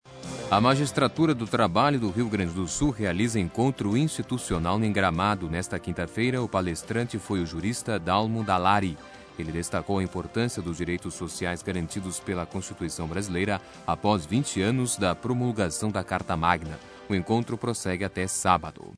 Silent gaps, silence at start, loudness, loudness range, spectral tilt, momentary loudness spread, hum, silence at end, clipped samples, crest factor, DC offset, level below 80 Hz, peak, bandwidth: none; 0.05 s; -27 LUFS; 5 LU; -5 dB/octave; 8 LU; none; 0 s; under 0.1%; 22 dB; under 0.1%; -48 dBFS; -6 dBFS; 11 kHz